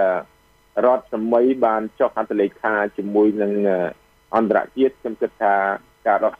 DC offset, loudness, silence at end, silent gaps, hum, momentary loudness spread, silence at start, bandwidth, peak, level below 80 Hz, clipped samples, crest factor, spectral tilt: under 0.1%; -20 LUFS; 0.05 s; none; none; 6 LU; 0 s; 5.8 kHz; -4 dBFS; -62 dBFS; under 0.1%; 16 dB; -8 dB/octave